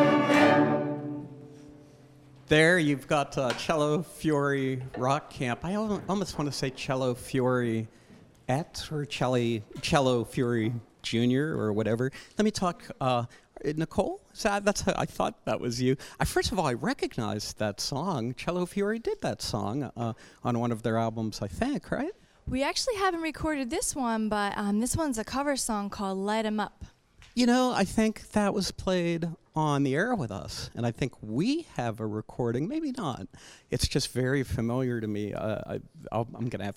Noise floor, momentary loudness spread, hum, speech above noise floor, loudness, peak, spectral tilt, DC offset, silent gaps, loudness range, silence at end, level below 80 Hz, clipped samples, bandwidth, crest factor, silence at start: -54 dBFS; 9 LU; none; 25 dB; -29 LUFS; -8 dBFS; -5 dB/octave; under 0.1%; none; 4 LU; 0 s; -50 dBFS; under 0.1%; 16 kHz; 20 dB; 0 s